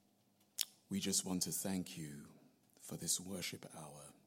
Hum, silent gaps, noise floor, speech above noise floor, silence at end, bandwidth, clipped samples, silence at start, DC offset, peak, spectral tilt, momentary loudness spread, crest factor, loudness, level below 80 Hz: none; none; -75 dBFS; 32 dB; 0.15 s; 16.5 kHz; under 0.1%; 0.6 s; under 0.1%; -12 dBFS; -3 dB/octave; 17 LU; 32 dB; -41 LUFS; -82 dBFS